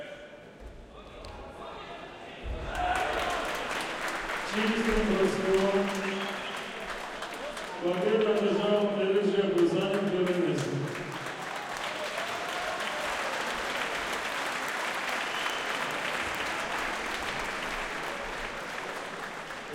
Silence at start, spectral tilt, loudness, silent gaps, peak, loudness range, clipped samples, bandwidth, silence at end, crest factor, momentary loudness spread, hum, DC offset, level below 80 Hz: 0 s; -4 dB/octave; -30 LUFS; none; -14 dBFS; 6 LU; under 0.1%; 17 kHz; 0 s; 18 dB; 16 LU; none; under 0.1%; -50 dBFS